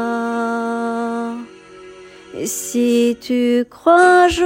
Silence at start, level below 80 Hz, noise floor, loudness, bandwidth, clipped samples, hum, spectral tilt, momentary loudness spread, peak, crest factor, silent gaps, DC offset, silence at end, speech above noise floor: 0 s; -48 dBFS; -39 dBFS; -17 LUFS; 16.5 kHz; under 0.1%; none; -3.5 dB/octave; 16 LU; 0 dBFS; 16 dB; none; under 0.1%; 0 s; 25 dB